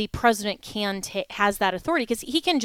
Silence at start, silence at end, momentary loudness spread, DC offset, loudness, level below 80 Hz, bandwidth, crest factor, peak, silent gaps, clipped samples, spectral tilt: 0 s; 0 s; 7 LU; under 0.1%; -25 LUFS; -48 dBFS; 18.5 kHz; 20 dB; -6 dBFS; none; under 0.1%; -3.5 dB/octave